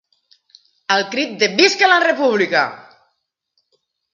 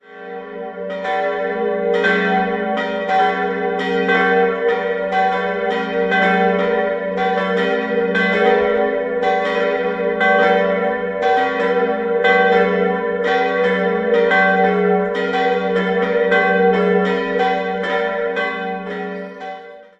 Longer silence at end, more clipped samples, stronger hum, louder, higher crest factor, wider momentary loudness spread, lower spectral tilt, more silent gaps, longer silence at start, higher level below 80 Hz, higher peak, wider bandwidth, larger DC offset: first, 1.35 s vs 0.15 s; neither; neither; about the same, -15 LUFS vs -17 LUFS; about the same, 18 dB vs 16 dB; about the same, 9 LU vs 8 LU; second, -2.5 dB/octave vs -6.5 dB/octave; neither; first, 0.9 s vs 0.1 s; second, -72 dBFS vs -54 dBFS; about the same, 0 dBFS vs -2 dBFS; about the same, 7.6 kHz vs 7.8 kHz; neither